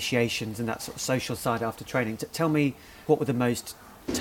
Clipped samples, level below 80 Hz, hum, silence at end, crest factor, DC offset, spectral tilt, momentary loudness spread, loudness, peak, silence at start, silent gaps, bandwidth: under 0.1%; -58 dBFS; none; 0 s; 20 dB; under 0.1%; -5 dB/octave; 8 LU; -28 LUFS; -8 dBFS; 0 s; none; 18.5 kHz